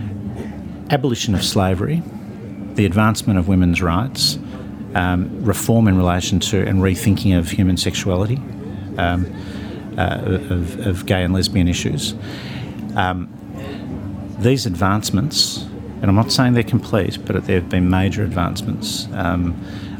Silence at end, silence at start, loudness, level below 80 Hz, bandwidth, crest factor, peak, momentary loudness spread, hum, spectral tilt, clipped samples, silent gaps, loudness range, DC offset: 0 s; 0 s; -19 LUFS; -42 dBFS; over 20 kHz; 18 dB; 0 dBFS; 14 LU; none; -5.5 dB/octave; under 0.1%; none; 4 LU; under 0.1%